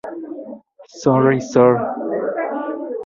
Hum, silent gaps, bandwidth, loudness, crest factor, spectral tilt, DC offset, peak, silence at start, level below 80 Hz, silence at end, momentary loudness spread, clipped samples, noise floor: none; none; 7.4 kHz; -18 LUFS; 18 dB; -7.5 dB/octave; under 0.1%; -2 dBFS; 0.05 s; -60 dBFS; 0 s; 17 LU; under 0.1%; -39 dBFS